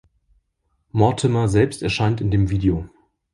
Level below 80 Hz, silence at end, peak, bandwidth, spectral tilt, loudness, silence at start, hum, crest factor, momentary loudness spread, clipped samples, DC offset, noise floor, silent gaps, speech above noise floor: -38 dBFS; 0.5 s; -2 dBFS; 11.5 kHz; -6.5 dB/octave; -20 LUFS; 0.95 s; none; 20 dB; 9 LU; under 0.1%; under 0.1%; -70 dBFS; none; 52 dB